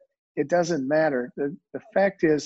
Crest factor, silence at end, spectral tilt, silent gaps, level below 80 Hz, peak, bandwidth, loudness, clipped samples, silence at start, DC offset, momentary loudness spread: 16 dB; 0 s; -6 dB/octave; none; -66 dBFS; -10 dBFS; 8 kHz; -25 LUFS; under 0.1%; 0.35 s; under 0.1%; 9 LU